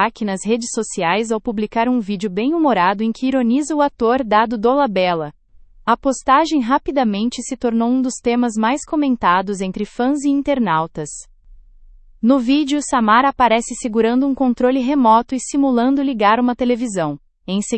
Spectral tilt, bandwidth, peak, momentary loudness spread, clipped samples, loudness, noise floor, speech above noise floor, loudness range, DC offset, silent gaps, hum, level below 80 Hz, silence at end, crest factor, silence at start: -4.5 dB/octave; 8.8 kHz; 0 dBFS; 8 LU; under 0.1%; -17 LUFS; -44 dBFS; 27 dB; 3 LU; under 0.1%; none; none; -46 dBFS; 0 s; 16 dB; 0 s